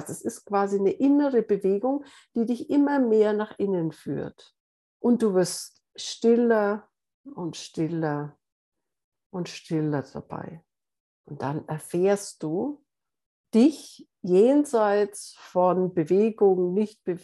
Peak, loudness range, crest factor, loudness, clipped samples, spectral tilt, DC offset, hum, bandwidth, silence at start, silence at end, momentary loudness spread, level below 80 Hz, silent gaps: -8 dBFS; 10 LU; 16 dB; -25 LUFS; under 0.1%; -6.5 dB/octave; under 0.1%; none; 12.5 kHz; 0 s; 0.05 s; 16 LU; -74 dBFS; 4.60-5.00 s, 7.14-7.24 s, 8.52-8.72 s, 9.04-9.12 s, 9.26-9.30 s, 11.00-11.24 s, 13.26-13.44 s